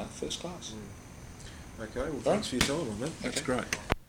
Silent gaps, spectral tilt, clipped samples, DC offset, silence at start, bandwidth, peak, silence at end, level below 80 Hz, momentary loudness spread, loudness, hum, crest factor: none; -4 dB/octave; under 0.1%; under 0.1%; 0 s; over 20 kHz; -6 dBFS; 0.05 s; -48 dBFS; 17 LU; -33 LUFS; none; 28 dB